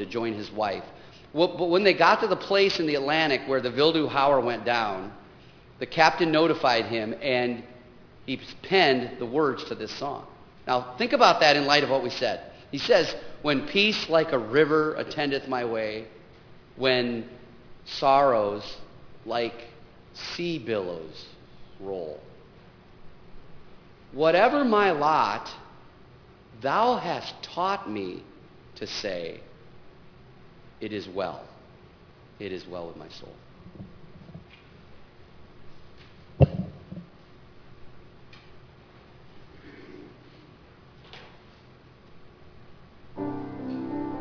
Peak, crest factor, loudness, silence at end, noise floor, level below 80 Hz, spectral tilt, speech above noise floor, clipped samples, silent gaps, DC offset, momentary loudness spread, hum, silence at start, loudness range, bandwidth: -2 dBFS; 26 dB; -25 LUFS; 0 s; -52 dBFS; -54 dBFS; -5 dB/octave; 27 dB; under 0.1%; none; under 0.1%; 24 LU; none; 0 s; 16 LU; 5.4 kHz